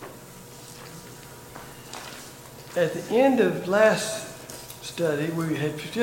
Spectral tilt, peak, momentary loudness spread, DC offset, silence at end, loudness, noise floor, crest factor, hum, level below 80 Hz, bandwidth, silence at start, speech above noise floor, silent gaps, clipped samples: -5 dB/octave; -6 dBFS; 22 LU; under 0.1%; 0 s; -24 LUFS; -44 dBFS; 22 dB; none; -60 dBFS; 17 kHz; 0 s; 21 dB; none; under 0.1%